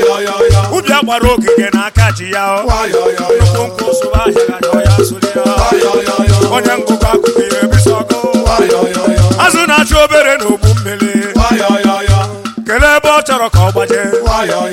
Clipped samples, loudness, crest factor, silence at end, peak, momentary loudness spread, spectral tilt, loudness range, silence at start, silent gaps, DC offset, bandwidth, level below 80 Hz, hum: 0.6%; -10 LUFS; 10 dB; 0 s; 0 dBFS; 5 LU; -5 dB/octave; 2 LU; 0 s; none; under 0.1%; 16.5 kHz; -22 dBFS; none